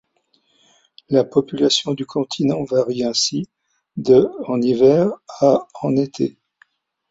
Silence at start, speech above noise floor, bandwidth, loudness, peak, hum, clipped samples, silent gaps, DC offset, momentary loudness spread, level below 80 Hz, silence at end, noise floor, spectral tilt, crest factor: 1.1 s; 46 dB; 8 kHz; -18 LUFS; -2 dBFS; none; under 0.1%; none; under 0.1%; 10 LU; -58 dBFS; 0.8 s; -64 dBFS; -5 dB/octave; 18 dB